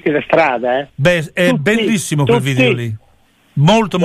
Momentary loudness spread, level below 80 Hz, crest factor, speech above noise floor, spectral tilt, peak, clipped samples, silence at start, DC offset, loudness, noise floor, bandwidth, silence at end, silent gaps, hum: 7 LU; -46 dBFS; 12 dB; 39 dB; -5.5 dB/octave; -2 dBFS; under 0.1%; 0.05 s; under 0.1%; -14 LUFS; -52 dBFS; 15 kHz; 0 s; none; none